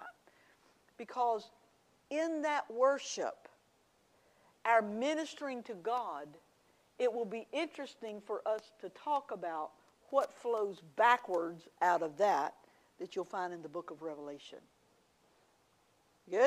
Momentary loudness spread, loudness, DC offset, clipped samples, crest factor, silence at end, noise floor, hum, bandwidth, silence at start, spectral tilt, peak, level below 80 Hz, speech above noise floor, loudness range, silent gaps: 16 LU; -36 LUFS; under 0.1%; under 0.1%; 22 dB; 0 s; -72 dBFS; none; 14.5 kHz; 0 s; -3.5 dB/octave; -14 dBFS; -88 dBFS; 36 dB; 7 LU; none